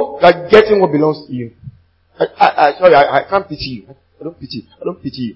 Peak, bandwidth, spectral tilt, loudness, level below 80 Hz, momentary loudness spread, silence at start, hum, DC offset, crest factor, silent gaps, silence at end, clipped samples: 0 dBFS; 8 kHz; -7 dB/octave; -12 LUFS; -46 dBFS; 21 LU; 0 s; none; under 0.1%; 14 dB; none; 0.05 s; 0.3%